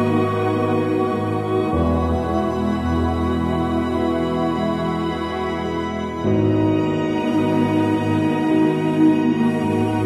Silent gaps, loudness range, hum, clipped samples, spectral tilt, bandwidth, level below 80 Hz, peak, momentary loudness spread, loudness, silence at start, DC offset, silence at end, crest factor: none; 3 LU; none; under 0.1%; -8 dB/octave; 12 kHz; -36 dBFS; -6 dBFS; 6 LU; -20 LUFS; 0 s; under 0.1%; 0 s; 14 dB